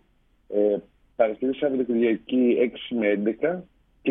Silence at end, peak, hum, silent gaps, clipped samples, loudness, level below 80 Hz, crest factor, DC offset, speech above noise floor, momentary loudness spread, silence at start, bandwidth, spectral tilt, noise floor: 0 s; -6 dBFS; none; none; under 0.1%; -24 LUFS; -62 dBFS; 18 dB; under 0.1%; 40 dB; 8 LU; 0.5 s; 3.9 kHz; -10 dB/octave; -63 dBFS